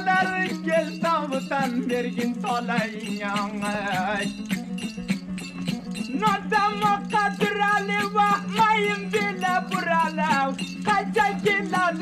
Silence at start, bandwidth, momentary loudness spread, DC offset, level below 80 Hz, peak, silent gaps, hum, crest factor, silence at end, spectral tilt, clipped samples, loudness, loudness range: 0 s; 14.5 kHz; 8 LU; under 0.1%; -58 dBFS; -8 dBFS; none; none; 16 dB; 0 s; -5 dB/octave; under 0.1%; -24 LUFS; 5 LU